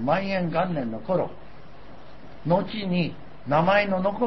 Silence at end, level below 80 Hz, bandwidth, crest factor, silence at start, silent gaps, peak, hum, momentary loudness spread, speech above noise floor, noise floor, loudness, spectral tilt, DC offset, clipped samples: 0 s; -52 dBFS; 6 kHz; 18 dB; 0 s; none; -6 dBFS; none; 10 LU; 23 dB; -47 dBFS; -25 LUFS; -8.5 dB/octave; 1%; under 0.1%